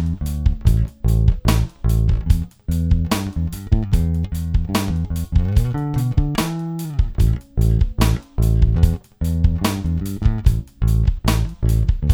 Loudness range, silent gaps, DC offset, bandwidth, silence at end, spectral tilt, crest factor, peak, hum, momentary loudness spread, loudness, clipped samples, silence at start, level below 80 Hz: 2 LU; none; under 0.1%; 17.5 kHz; 0 s; -6.5 dB/octave; 16 dB; 0 dBFS; none; 5 LU; -20 LUFS; under 0.1%; 0 s; -20 dBFS